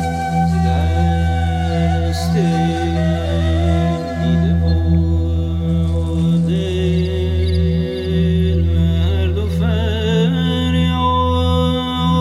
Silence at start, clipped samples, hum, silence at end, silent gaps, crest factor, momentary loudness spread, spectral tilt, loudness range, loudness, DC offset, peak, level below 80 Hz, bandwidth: 0 s; under 0.1%; none; 0 s; none; 10 dB; 3 LU; -7.5 dB/octave; 1 LU; -17 LUFS; under 0.1%; -4 dBFS; -24 dBFS; 11.5 kHz